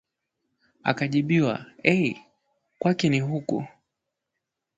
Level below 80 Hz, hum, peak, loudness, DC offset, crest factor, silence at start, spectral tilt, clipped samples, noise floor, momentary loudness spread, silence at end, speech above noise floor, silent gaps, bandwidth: -64 dBFS; none; -4 dBFS; -25 LUFS; under 0.1%; 24 dB; 0.85 s; -6.5 dB/octave; under 0.1%; -83 dBFS; 9 LU; 1.1 s; 60 dB; none; 7.8 kHz